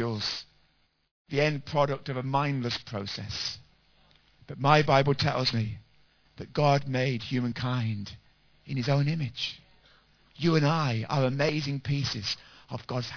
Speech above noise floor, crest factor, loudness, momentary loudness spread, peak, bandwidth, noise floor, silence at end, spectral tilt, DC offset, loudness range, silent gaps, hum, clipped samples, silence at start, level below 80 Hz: 41 dB; 24 dB; -28 LUFS; 13 LU; -4 dBFS; 5.4 kHz; -69 dBFS; 0 s; -6 dB/octave; under 0.1%; 4 LU; 1.11-1.25 s; none; under 0.1%; 0 s; -58 dBFS